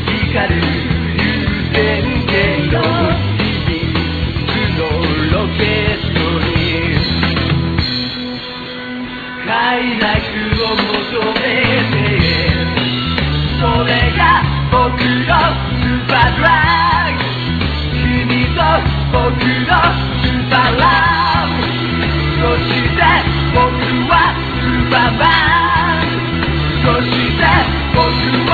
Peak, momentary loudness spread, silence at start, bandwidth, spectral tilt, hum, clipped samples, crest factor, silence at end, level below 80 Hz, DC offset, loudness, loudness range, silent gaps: 0 dBFS; 6 LU; 0 s; 4.9 kHz; -8 dB/octave; none; under 0.1%; 14 dB; 0 s; -24 dBFS; under 0.1%; -14 LUFS; 4 LU; none